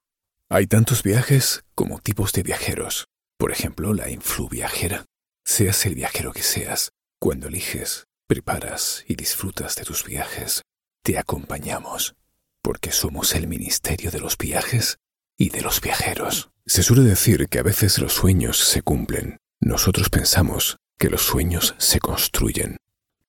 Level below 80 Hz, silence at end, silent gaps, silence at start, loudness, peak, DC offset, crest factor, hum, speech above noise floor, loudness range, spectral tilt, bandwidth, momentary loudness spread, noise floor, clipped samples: -36 dBFS; 0.5 s; none; 0.5 s; -21 LUFS; -4 dBFS; under 0.1%; 18 dB; none; 58 dB; 7 LU; -3.5 dB/octave; 17.5 kHz; 10 LU; -80 dBFS; under 0.1%